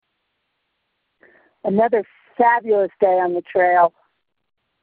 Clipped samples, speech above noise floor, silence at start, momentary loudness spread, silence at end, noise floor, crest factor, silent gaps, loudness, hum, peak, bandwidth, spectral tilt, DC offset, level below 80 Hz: under 0.1%; 56 dB; 1.65 s; 7 LU; 0.95 s; -73 dBFS; 18 dB; none; -18 LUFS; none; -2 dBFS; 4.4 kHz; -11 dB/octave; under 0.1%; -66 dBFS